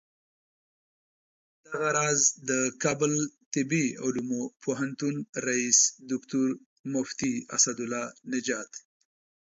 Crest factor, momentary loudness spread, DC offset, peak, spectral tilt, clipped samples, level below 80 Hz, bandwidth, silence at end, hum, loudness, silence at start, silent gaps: 22 dB; 12 LU; under 0.1%; -8 dBFS; -3 dB/octave; under 0.1%; -72 dBFS; 8 kHz; 0.65 s; none; -27 LUFS; 1.7 s; 3.46-3.51 s, 4.56-4.60 s, 5.29-5.33 s, 6.66-6.84 s